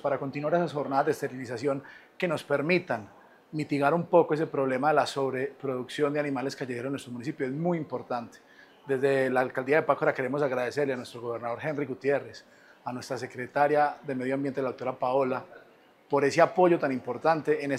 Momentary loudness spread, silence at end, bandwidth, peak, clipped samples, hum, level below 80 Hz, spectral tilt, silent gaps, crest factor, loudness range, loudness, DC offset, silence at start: 11 LU; 0 s; 14.5 kHz; -6 dBFS; under 0.1%; none; -78 dBFS; -6.5 dB/octave; none; 22 dB; 4 LU; -28 LUFS; under 0.1%; 0.05 s